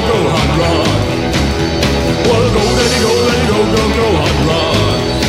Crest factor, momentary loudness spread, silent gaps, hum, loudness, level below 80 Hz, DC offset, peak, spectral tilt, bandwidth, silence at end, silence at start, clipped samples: 12 dB; 3 LU; none; none; -12 LUFS; -24 dBFS; under 0.1%; 0 dBFS; -5 dB/octave; 16 kHz; 0 s; 0 s; under 0.1%